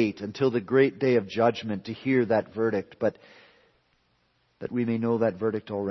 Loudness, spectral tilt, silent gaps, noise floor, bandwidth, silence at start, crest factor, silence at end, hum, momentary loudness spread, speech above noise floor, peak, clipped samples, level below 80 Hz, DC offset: -26 LUFS; -7.5 dB/octave; none; -69 dBFS; 6.2 kHz; 0 s; 18 dB; 0 s; none; 9 LU; 43 dB; -8 dBFS; under 0.1%; -68 dBFS; under 0.1%